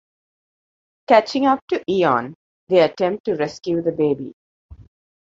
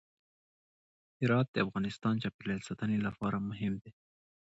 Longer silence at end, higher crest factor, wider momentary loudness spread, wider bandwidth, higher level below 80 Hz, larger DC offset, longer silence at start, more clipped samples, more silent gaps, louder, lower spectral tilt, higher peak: second, 0.4 s vs 0.6 s; about the same, 20 dB vs 18 dB; about the same, 8 LU vs 8 LU; about the same, 7.8 kHz vs 8 kHz; first, -56 dBFS vs -64 dBFS; neither; about the same, 1.1 s vs 1.2 s; neither; first, 1.62-1.68 s, 2.35-2.67 s, 3.20-3.24 s, 4.33-4.69 s vs 1.48-1.54 s, 2.34-2.39 s; first, -19 LUFS vs -34 LUFS; about the same, -6 dB/octave vs -7 dB/octave; first, -2 dBFS vs -16 dBFS